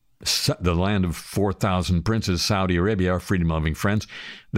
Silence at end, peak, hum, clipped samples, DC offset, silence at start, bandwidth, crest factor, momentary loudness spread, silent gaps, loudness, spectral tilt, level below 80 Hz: 0 s; -8 dBFS; none; under 0.1%; under 0.1%; 0.2 s; 16 kHz; 14 dB; 4 LU; none; -23 LUFS; -5 dB/octave; -38 dBFS